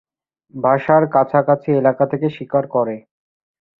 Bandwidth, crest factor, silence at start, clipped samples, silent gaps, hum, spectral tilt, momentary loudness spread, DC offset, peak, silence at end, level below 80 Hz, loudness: 4.2 kHz; 18 dB; 0.55 s; under 0.1%; none; none; -10.5 dB/octave; 9 LU; under 0.1%; 0 dBFS; 0.8 s; -62 dBFS; -17 LUFS